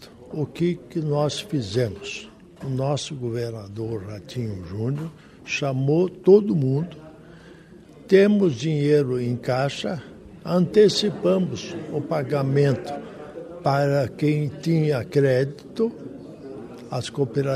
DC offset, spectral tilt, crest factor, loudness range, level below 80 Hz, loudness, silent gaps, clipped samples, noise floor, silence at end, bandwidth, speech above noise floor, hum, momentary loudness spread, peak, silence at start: under 0.1%; -6.5 dB/octave; 20 dB; 7 LU; -58 dBFS; -23 LUFS; none; under 0.1%; -46 dBFS; 0 s; 13 kHz; 24 dB; none; 19 LU; -4 dBFS; 0 s